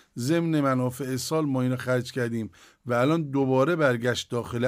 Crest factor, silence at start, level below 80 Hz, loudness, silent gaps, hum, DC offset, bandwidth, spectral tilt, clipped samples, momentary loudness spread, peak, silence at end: 16 dB; 0.15 s; -64 dBFS; -26 LUFS; none; none; under 0.1%; 16 kHz; -6 dB/octave; under 0.1%; 8 LU; -10 dBFS; 0 s